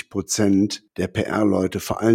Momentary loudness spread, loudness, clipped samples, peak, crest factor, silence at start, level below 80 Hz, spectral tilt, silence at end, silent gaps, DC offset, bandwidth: 7 LU; -21 LUFS; under 0.1%; -4 dBFS; 16 dB; 0.15 s; -52 dBFS; -5 dB/octave; 0 s; none; under 0.1%; 16.5 kHz